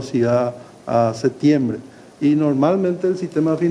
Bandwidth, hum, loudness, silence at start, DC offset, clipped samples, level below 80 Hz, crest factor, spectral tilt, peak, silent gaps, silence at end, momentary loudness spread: 10.5 kHz; none; -19 LUFS; 0 s; under 0.1%; under 0.1%; -60 dBFS; 14 dB; -8 dB/octave; -4 dBFS; none; 0 s; 7 LU